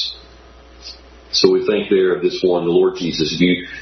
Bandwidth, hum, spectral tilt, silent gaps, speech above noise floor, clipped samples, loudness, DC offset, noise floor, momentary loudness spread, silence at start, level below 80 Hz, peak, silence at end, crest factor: 6.4 kHz; none; -5 dB/octave; none; 27 dB; under 0.1%; -16 LUFS; under 0.1%; -43 dBFS; 21 LU; 0 s; -48 dBFS; 0 dBFS; 0 s; 18 dB